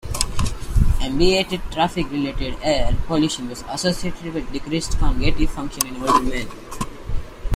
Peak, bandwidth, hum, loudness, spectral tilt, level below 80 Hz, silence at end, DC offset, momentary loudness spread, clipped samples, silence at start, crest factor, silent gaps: 0 dBFS; 16 kHz; none; -23 LUFS; -4.5 dB/octave; -24 dBFS; 0 s; under 0.1%; 11 LU; under 0.1%; 0.05 s; 20 dB; none